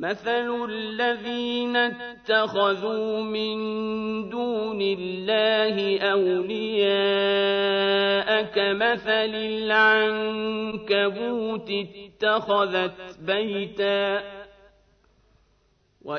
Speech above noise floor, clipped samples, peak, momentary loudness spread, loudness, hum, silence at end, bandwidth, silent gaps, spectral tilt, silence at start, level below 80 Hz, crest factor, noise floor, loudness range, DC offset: 41 dB; under 0.1%; -6 dBFS; 8 LU; -24 LUFS; none; 0 s; 6.4 kHz; none; -6 dB/octave; 0 s; -64 dBFS; 18 dB; -65 dBFS; 4 LU; under 0.1%